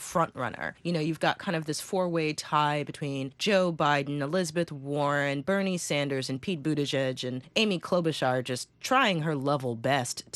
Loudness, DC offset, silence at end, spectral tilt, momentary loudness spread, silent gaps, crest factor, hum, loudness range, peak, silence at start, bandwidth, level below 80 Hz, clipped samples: -28 LUFS; under 0.1%; 0.15 s; -4.5 dB/octave; 7 LU; none; 18 dB; none; 2 LU; -10 dBFS; 0 s; 12.5 kHz; -68 dBFS; under 0.1%